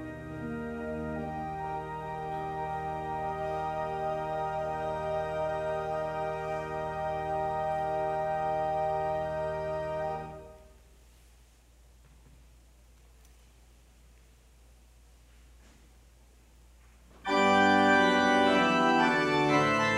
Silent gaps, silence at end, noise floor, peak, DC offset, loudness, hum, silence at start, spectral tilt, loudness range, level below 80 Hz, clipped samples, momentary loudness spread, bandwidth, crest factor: none; 0 s; -59 dBFS; -12 dBFS; under 0.1%; -30 LUFS; none; 0 s; -5 dB/octave; 12 LU; -54 dBFS; under 0.1%; 13 LU; 14 kHz; 20 dB